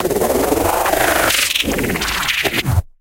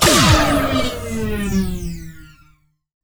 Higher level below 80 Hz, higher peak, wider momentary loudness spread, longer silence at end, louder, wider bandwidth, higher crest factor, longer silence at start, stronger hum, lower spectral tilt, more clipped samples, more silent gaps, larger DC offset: about the same, -30 dBFS vs -28 dBFS; about the same, -2 dBFS vs -2 dBFS; second, 5 LU vs 19 LU; second, 0.15 s vs 0.75 s; about the same, -16 LUFS vs -17 LUFS; second, 17 kHz vs over 20 kHz; about the same, 16 dB vs 16 dB; about the same, 0 s vs 0 s; neither; about the same, -3 dB/octave vs -4 dB/octave; neither; neither; neither